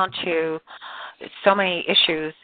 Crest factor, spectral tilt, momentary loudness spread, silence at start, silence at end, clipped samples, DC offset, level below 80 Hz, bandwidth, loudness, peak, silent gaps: 20 dB; -7.5 dB/octave; 19 LU; 0 s; 0.1 s; under 0.1%; under 0.1%; -64 dBFS; 4.8 kHz; -20 LUFS; -2 dBFS; none